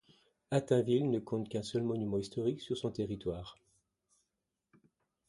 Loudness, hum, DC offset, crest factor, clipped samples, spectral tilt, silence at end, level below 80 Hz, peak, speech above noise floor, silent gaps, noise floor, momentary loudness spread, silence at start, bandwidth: -35 LUFS; none; under 0.1%; 20 dB; under 0.1%; -7 dB/octave; 1.75 s; -64 dBFS; -16 dBFS; 53 dB; none; -87 dBFS; 9 LU; 0.5 s; 11.5 kHz